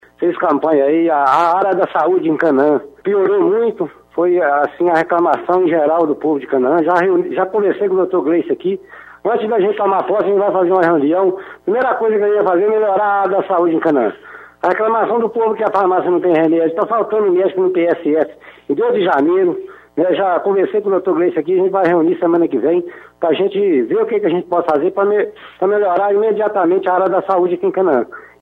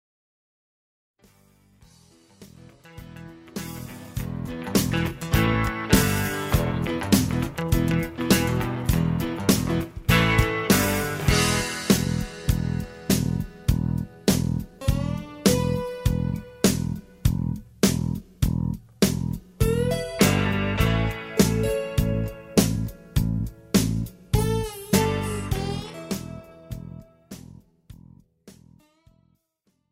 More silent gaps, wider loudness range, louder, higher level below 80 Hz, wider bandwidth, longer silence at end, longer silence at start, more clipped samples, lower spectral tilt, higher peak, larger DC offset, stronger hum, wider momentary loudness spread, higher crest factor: neither; second, 2 LU vs 10 LU; first, -15 LUFS vs -24 LUFS; second, -62 dBFS vs -34 dBFS; second, 5 kHz vs 16 kHz; second, 0.15 s vs 1.4 s; second, 0.2 s vs 2.4 s; neither; first, -8 dB/octave vs -5 dB/octave; about the same, -2 dBFS vs -2 dBFS; neither; neither; second, 5 LU vs 12 LU; second, 12 dB vs 22 dB